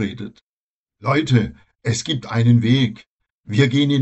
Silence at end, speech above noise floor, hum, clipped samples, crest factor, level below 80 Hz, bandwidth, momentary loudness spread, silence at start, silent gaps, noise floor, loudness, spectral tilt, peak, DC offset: 0 s; over 72 dB; none; under 0.1%; 16 dB; -50 dBFS; 8.4 kHz; 13 LU; 0 s; 0.41-0.86 s, 3.07-3.19 s, 3.30-3.44 s; under -90 dBFS; -19 LUFS; -6 dB/octave; -2 dBFS; under 0.1%